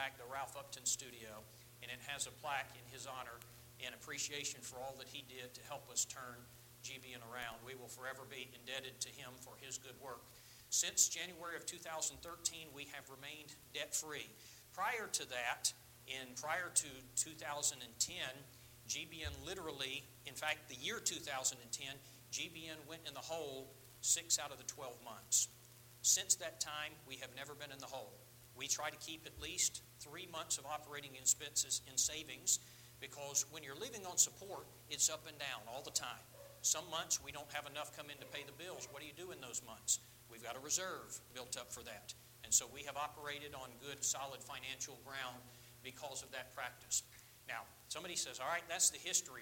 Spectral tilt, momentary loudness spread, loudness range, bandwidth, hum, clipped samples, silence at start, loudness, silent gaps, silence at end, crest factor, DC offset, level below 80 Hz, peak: 0 dB/octave; 18 LU; 8 LU; 17 kHz; none; under 0.1%; 0 s; -41 LUFS; none; 0 s; 26 dB; under 0.1%; -72 dBFS; -18 dBFS